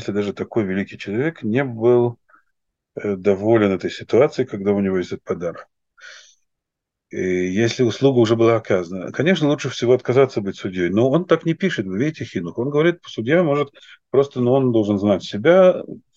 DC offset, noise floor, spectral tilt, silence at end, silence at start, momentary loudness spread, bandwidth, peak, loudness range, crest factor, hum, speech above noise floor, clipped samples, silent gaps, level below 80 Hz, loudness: under 0.1%; -82 dBFS; -7 dB/octave; 0.2 s; 0 s; 11 LU; 7.6 kHz; -2 dBFS; 5 LU; 18 dB; none; 64 dB; under 0.1%; none; -62 dBFS; -19 LUFS